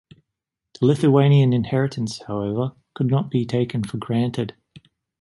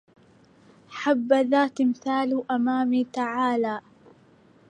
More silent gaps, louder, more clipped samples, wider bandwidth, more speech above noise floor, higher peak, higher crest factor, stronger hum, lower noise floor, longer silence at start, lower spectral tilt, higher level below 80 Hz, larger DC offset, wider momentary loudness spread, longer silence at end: neither; first, -21 LUFS vs -24 LUFS; neither; first, 11.5 kHz vs 9.2 kHz; first, 63 dB vs 33 dB; first, -4 dBFS vs -8 dBFS; about the same, 18 dB vs 18 dB; neither; first, -83 dBFS vs -56 dBFS; about the same, 0.8 s vs 0.9 s; first, -8 dB/octave vs -5.5 dB/octave; first, -54 dBFS vs -76 dBFS; neither; first, 12 LU vs 8 LU; second, 0.7 s vs 0.9 s